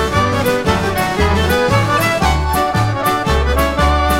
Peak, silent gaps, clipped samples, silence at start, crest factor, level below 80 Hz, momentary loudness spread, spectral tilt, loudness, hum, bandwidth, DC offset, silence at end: -2 dBFS; none; under 0.1%; 0 s; 12 dB; -22 dBFS; 2 LU; -5 dB/octave; -15 LUFS; none; 16.5 kHz; under 0.1%; 0 s